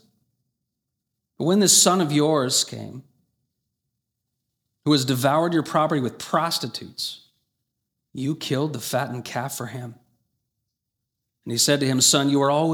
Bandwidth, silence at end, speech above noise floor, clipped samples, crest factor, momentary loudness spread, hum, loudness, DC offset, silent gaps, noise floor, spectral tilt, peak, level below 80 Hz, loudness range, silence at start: over 20 kHz; 0 s; 60 dB; under 0.1%; 22 dB; 15 LU; none; -21 LUFS; under 0.1%; none; -81 dBFS; -3.5 dB/octave; -2 dBFS; -70 dBFS; 9 LU; 1.4 s